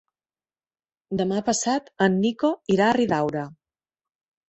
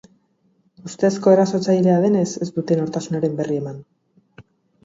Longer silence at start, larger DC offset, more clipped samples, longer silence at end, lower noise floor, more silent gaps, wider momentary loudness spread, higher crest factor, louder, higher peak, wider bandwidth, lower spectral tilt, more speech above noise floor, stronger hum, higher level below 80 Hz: first, 1.1 s vs 0.85 s; neither; neither; first, 0.95 s vs 0.45 s; first, under -90 dBFS vs -63 dBFS; neither; second, 9 LU vs 16 LU; about the same, 20 dB vs 18 dB; second, -23 LUFS vs -19 LUFS; about the same, -4 dBFS vs -2 dBFS; about the same, 8.4 kHz vs 7.8 kHz; second, -5 dB/octave vs -7 dB/octave; first, over 68 dB vs 44 dB; neither; about the same, -62 dBFS vs -64 dBFS